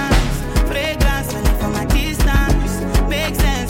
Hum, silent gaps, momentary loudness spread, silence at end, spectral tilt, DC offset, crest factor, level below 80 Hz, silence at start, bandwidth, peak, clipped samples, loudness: none; none; 3 LU; 0 s; -5 dB/octave; under 0.1%; 14 dB; -18 dBFS; 0 s; 17 kHz; -2 dBFS; under 0.1%; -18 LUFS